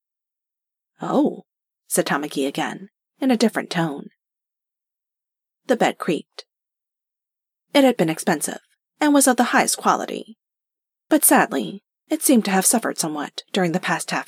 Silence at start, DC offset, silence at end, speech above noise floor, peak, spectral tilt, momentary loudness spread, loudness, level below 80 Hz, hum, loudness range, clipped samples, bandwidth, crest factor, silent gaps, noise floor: 1 s; under 0.1%; 0.05 s; 67 dB; -2 dBFS; -3.5 dB/octave; 13 LU; -20 LUFS; -82 dBFS; none; 8 LU; under 0.1%; 16.5 kHz; 20 dB; none; -87 dBFS